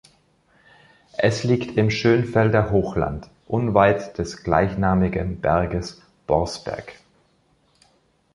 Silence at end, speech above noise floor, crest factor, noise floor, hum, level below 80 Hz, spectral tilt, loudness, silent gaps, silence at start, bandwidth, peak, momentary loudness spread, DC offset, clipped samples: 1.4 s; 42 dB; 20 dB; -62 dBFS; none; -40 dBFS; -7 dB/octave; -21 LUFS; none; 1.2 s; 11.5 kHz; -2 dBFS; 14 LU; under 0.1%; under 0.1%